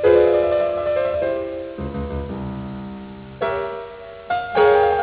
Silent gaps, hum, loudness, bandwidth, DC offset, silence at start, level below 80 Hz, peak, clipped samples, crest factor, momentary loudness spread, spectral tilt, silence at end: none; none; -21 LUFS; 4 kHz; under 0.1%; 0 s; -40 dBFS; -2 dBFS; under 0.1%; 18 dB; 18 LU; -10 dB/octave; 0 s